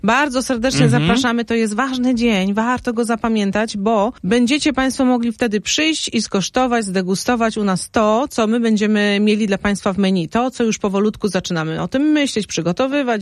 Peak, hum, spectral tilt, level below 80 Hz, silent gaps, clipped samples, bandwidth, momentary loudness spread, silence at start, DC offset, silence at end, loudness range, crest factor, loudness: -2 dBFS; none; -5 dB/octave; -44 dBFS; none; under 0.1%; 12.5 kHz; 4 LU; 0.05 s; under 0.1%; 0 s; 1 LU; 16 dB; -17 LUFS